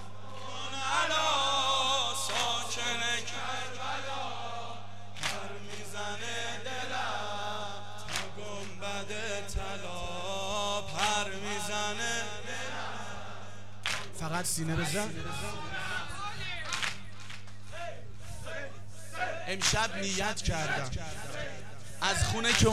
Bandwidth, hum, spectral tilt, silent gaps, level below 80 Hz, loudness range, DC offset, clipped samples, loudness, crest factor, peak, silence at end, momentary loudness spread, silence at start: 16 kHz; none; -2.5 dB/octave; none; -50 dBFS; 8 LU; 1%; under 0.1%; -33 LUFS; 24 dB; -10 dBFS; 0 s; 16 LU; 0 s